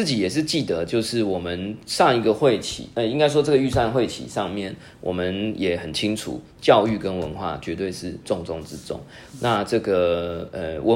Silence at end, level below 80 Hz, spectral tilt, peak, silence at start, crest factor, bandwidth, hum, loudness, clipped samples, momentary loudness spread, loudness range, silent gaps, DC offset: 0 s; -50 dBFS; -5 dB/octave; -2 dBFS; 0 s; 22 dB; 16 kHz; none; -23 LUFS; under 0.1%; 13 LU; 4 LU; none; under 0.1%